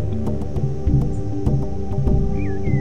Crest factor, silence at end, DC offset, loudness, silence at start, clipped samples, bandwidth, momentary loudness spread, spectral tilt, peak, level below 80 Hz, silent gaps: 14 dB; 0 s; 6%; -22 LUFS; 0 s; under 0.1%; 7.4 kHz; 4 LU; -9.5 dB/octave; -4 dBFS; -26 dBFS; none